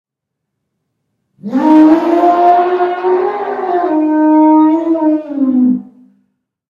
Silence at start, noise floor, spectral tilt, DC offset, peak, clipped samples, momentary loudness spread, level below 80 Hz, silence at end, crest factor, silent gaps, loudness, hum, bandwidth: 1.45 s; -76 dBFS; -7.5 dB/octave; under 0.1%; 0 dBFS; 0.2%; 9 LU; -62 dBFS; 0.85 s; 12 dB; none; -11 LUFS; none; 5.4 kHz